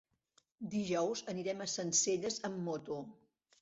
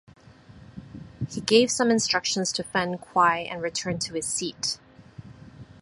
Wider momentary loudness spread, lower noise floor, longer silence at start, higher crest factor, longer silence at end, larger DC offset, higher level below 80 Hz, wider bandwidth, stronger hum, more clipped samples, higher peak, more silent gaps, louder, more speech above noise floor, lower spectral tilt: second, 13 LU vs 22 LU; first, -75 dBFS vs -50 dBFS; about the same, 0.6 s vs 0.55 s; about the same, 20 dB vs 22 dB; first, 0.5 s vs 0.15 s; neither; second, -78 dBFS vs -58 dBFS; second, 8 kHz vs 11.5 kHz; neither; neither; second, -18 dBFS vs -4 dBFS; neither; second, -37 LUFS vs -24 LUFS; first, 38 dB vs 25 dB; first, -4.5 dB/octave vs -3 dB/octave